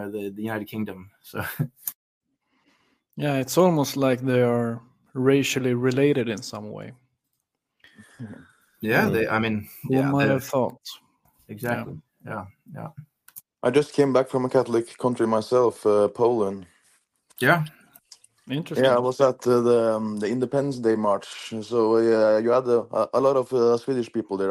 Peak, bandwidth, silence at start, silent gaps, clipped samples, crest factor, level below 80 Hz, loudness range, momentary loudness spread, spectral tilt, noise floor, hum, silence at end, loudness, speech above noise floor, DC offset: -4 dBFS; 15.5 kHz; 0 s; 1.95-2.21 s; under 0.1%; 18 dB; -66 dBFS; 6 LU; 18 LU; -6 dB/octave; -79 dBFS; none; 0 s; -23 LUFS; 56 dB; under 0.1%